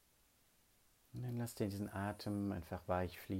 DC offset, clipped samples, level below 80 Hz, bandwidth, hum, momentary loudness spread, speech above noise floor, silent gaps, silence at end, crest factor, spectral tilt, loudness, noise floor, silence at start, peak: under 0.1%; under 0.1%; -66 dBFS; 16 kHz; none; 5 LU; 31 dB; none; 0 s; 20 dB; -6.5 dB/octave; -43 LUFS; -73 dBFS; 1.15 s; -24 dBFS